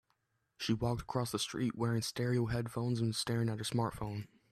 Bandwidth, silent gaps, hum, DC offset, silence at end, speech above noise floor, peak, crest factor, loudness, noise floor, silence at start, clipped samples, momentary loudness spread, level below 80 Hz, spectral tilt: 13.5 kHz; none; none; under 0.1%; 0.25 s; 45 dB; -20 dBFS; 16 dB; -36 LUFS; -80 dBFS; 0.6 s; under 0.1%; 4 LU; -60 dBFS; -5.5 dB/octave